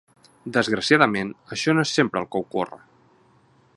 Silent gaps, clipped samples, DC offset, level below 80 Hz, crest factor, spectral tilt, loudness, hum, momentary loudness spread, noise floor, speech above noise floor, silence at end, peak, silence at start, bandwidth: none; under 0.1%; under 0.1%; -62 dBFS; 24 dB; -4.5 dB/octave; -22 LUFS; none; 12 LU; -58 dBFS; 36 dB; 1 s; 0 dBFS; 0.45 s; 11.5 kHz